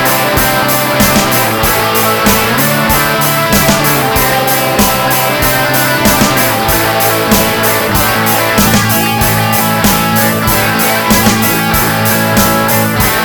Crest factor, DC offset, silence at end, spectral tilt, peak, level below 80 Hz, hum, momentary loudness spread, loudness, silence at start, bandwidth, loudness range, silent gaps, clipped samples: 10 dB; under 0.1%; 0 s; -3.5 dB/octave; 0 dBFS; -28 dBFS; none; 2 LU; -9 LUFS; 0 s; over 20 kHz; 0 LU; none; 0.2%